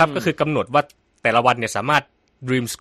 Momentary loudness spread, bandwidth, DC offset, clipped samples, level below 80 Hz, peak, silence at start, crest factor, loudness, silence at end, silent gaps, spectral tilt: 6 LU; 13.5 kHz; under 0.1%; under 0.1%; -56 dBFS; -2 dBFS; 0 s; 18 dB; -20 LUFS; 0.05 s; none; -4.5 dB/octave